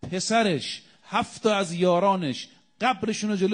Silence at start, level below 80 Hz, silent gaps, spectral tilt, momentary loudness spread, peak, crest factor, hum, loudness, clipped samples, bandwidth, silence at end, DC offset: 0.05 s; -64 dBFS; none; -4.5 dB/octave; 12 LU; -8 dBFS; 16 dB; none; -25 LUFS; under 0.1%; 10 kHz; 0 s; under 0.1%